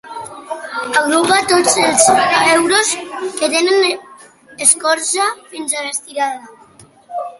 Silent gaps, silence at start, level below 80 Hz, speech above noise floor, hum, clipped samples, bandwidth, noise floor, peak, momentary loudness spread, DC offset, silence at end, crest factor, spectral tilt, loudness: none; 0.05 s; -58 dBFS; 31 dB; none; under 0.1%; 16 kHz; -45 dBFS; 0 dBFS; 16 LU; under 0.1%; 0.05 s; 16 dB; -1 dB/octave; -14 LUFS